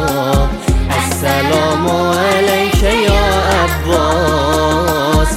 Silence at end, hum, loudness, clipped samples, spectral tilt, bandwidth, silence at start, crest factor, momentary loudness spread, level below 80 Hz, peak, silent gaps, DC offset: 0 s; none; -13 LUFS; under 0.1%; -5 dB/octave; 16.5 kHz; 0 s; 12 dB; 3 LU; -20 dBFS; 0 dBFS; none; under 0.1%